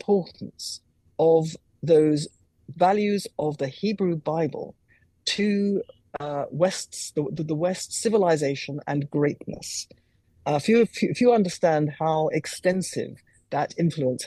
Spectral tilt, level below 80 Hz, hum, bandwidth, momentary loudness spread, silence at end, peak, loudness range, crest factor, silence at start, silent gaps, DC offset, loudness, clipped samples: -5.5 dB/octave; -64 dBFS; none; 12.5 kHz; 14 LU; 0 s; -8 dBFS; 4 LU; 18 dB; 0.1 s; none; under 0.1%; -25 LUFS; under 0.1%